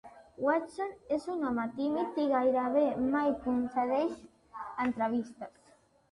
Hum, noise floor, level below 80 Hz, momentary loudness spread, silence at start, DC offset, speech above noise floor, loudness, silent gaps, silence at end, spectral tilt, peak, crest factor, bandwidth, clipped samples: none; -64 dBFS; -66 dBFS; 15 LU; 0.05 s; under 0.1%; 33 dB; -32 LUFS; none; 0.6 s; -6.5 dB/octave; -16 dBFS; 16 dB; 11 kHz; under 0.1%